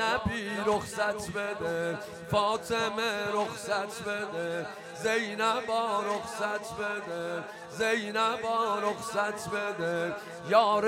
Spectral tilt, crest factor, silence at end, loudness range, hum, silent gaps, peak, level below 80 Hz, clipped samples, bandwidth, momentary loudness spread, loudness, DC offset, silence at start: -4 dB/octave; 20 dB; 0 s; 1 LU; none; none; -10 dBFS; -60 dBFS; under 0.1%; 16 kHz; 7 LU; -31 LUFS; under 0.1%; 0 s